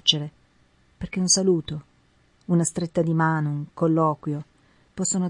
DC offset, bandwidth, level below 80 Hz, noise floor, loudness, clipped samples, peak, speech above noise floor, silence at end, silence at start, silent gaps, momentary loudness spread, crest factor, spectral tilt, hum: under 0.1%; 11.5 kHz; -56 dBFS; -61 dBFS; -23 LUFS; under 0.1%; -2 dBFS; 38 dB; 0 s; 0.05 s; none; 18 LU; 22 dB; -4 dB/octave; none